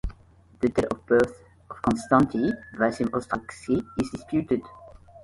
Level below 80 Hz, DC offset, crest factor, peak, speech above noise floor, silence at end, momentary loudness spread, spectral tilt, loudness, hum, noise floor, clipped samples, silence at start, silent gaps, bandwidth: -46 dBFS; under 0.1%; 20 dB; -6 dBFS; 29 dB; 0.05 s; 9 LU; -7 dB/octave; -26 LUFS; none; -54 dBFS; under 0.1%; 0.05 s; none; 11.5 kHz